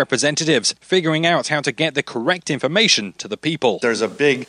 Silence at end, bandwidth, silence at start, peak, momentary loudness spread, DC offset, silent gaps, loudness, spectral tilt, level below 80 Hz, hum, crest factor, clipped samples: 0.05 s; 11 kHz; 0 s; -2 dBFS; 6 LU; under 0.1%; none; -18 LUFS; -3 dB/octave; -66 dBFS; none; 16 dB; under 0.1%